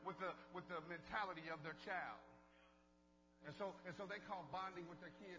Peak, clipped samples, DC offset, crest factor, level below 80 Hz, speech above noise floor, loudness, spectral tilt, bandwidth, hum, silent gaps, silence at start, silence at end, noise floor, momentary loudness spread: -32 dBFS; under 0.1%; under 0.1%; 20 dB; -78 dBFS; 22 dB; -51 LUFS; -5.5 dB/octave; 8 kHz; 60 Hz at -70 dBFS; none; 0 s; 0 s; -74 dBFS; 12 LU